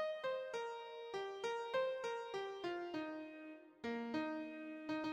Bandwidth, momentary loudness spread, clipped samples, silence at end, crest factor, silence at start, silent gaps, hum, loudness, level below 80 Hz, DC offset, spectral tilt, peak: 11 kHz; 9 LU; under 0.1%; 0 s; 16 dB; 0 s; none; none; -44 LUFS; -84 dBFS; under 0.1%; -4.5 dB/octave; -28 dBFS